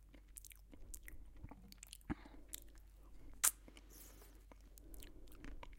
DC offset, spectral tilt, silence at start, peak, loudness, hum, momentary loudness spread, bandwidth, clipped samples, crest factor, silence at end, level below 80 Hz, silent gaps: under 0.1%; -1.5 dB/octave; 0 s; -8 dBFS; -43 LUFS; none; 27 LU; 16.5 kHz; under 0.1%; 40 dB; 0 s; -58 dBFS; none